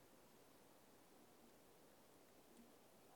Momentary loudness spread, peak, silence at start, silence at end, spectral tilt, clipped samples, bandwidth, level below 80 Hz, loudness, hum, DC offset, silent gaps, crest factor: 1 LU; -54 dBFS; 0 s; 0 s; -3.5 dB/octave; under 0.1%; 19 kHz; -90 dBFS; -69 LUFS; none; under 0.1%; none; 14 dB